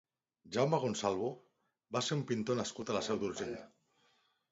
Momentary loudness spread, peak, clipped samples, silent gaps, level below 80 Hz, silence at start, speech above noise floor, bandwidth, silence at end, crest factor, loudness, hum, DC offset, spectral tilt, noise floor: 9 LU; -18 dBFS; under 0.1%; none; -72 dBFS; 0.45 s; 39 dB; 7.6 kHz; 0.85 s; 20 dB; -36 LUFS; none; under 0.1%; -4.5 dB/octave; -74 dBFS